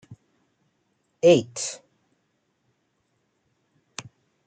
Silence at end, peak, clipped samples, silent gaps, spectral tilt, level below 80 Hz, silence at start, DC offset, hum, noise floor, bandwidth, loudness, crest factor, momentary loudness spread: 0.45 s; -4 dBFS; under 0.1%; none; -4.5 dB/octave; -72 dBFS; 0.1 s; under 0.1%; none; -72 dBFS; 9.4 kHz; -22 LUFS; 24 dB; 22 LU